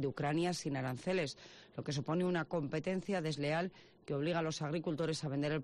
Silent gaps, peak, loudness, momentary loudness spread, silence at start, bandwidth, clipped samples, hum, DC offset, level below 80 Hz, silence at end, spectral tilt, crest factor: none; -26 dBFS; -37 LUFS; 7 LU; 0 s; 12 kHz; under 0.1%; none; under 0.1%; -68 dBFS; 0 s; -6 dB/octave; 12 dB